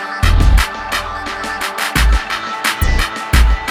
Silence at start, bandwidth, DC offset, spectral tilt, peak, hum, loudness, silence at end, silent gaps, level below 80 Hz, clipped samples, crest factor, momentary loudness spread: 0 s; 16.5 kHz; under 0.1%; -4 dB/octave; 0 dBFS; none; -16 LUFS; 0 s; none; -16 dBFS; under 0.1%; 14 dB; 7 LU